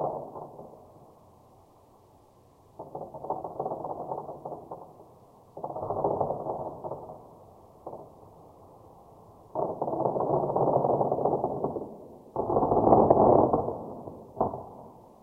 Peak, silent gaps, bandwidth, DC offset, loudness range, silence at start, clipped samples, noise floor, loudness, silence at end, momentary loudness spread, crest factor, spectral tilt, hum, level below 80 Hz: -4 dBFS; none; 2.6 kHz; under 0.1%; 16 LU; 0 s; under 0.1%; -58 dBFS; -28 LUFS; 0.2 s; 24 LU; 26 dB; -11.5 dB/octave; none; -56 dBFS